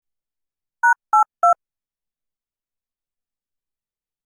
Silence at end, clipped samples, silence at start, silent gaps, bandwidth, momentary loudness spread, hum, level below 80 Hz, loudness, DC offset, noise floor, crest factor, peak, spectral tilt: 2.75 s; under 0.1%; 0.85 s; none; 15.5 kHz; 4 LU; none; -88 dBFS; -18 LUFS; under 0.1%; under -90 dBFS; 18 dB; -6 dBFS; 0 dB/octave